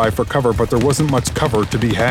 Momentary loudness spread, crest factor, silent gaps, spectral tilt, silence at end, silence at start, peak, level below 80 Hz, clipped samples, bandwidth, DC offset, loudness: 2 LU; 14 dB; none; -5.5 dB/octave; 0 s; 0 s; -2 dBFS; -32 dBFS; under 0.1%; 16.5 kHz; under 0.1%; -17 LUFS